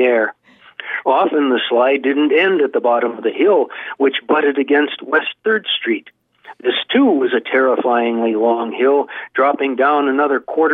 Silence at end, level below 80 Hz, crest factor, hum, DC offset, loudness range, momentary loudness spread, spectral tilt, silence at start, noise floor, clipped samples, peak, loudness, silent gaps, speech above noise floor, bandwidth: 0 s; -74 dBFS; 14 dB; none; under 0.1%; 2 LU; 6 LU; -7 dB/octave; 0 s; -36 dBFS; under 0.1%; -2 dBFS; -16 LUFS; none; 20 dB; 4 kHz